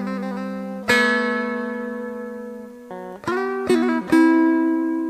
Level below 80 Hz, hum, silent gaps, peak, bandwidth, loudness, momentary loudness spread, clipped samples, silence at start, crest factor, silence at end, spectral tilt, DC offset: -60 dBFS; none; none; -4 dBFS; 12.5 kHz; -20 LUFS; 18 LU; under 0.1%; 0 s; 18 dB; 0 s; -5 dB/octave; under 0.1%